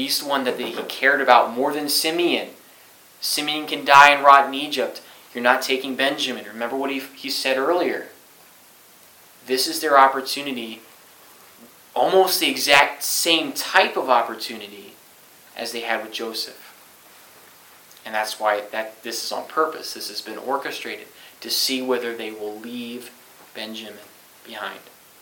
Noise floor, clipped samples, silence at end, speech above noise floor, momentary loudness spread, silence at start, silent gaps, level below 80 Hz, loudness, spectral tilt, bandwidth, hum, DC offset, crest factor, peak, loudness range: -50 dBFS; under 0.1%; 0.4 s; 29 dB; 18 LU; 0 s; none; -72 dBFS; -20 LUFS; -1.5 dB/octave; 17.5 kHz; none; under 0.1%; 22 dB; 0 dBFS; 11 LU